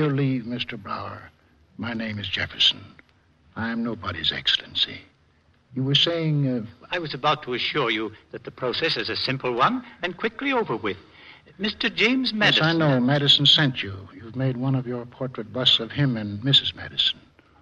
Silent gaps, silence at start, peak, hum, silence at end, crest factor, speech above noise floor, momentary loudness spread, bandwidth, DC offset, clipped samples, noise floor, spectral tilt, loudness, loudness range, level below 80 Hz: none; 0 s; -6 dBFS; none; 0.45 s; 18 dB; 37 dB; 14 LU; 10.5 kHz; under 0.1%; under 0.1%; -61 dBFS; -5.5 dB/octave; -22 LUFS; 6 LU; -58 dBFS